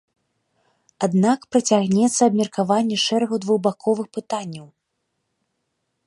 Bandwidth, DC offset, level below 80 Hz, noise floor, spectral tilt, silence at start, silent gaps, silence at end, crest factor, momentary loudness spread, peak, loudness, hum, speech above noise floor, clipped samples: 11.5 kHz; under 0.1%; -68 dBFS; -75 dBFS; -5 dB/octave; 1 s; none; 1.4 s; 18 dB; 11 LU; -4 dBFS; -20 LUFS; none; 56 dB; under 0.1%